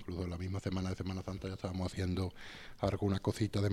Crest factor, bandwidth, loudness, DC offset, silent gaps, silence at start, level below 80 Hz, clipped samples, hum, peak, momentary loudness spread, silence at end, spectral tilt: 18 dB; 13.5 kHz; -38 LUFS; under 0.1%; none; 0 s; -56 dBFS; under 0.1%; none; -18 dBFS; 7 LU; 0 s; -7 dB/octave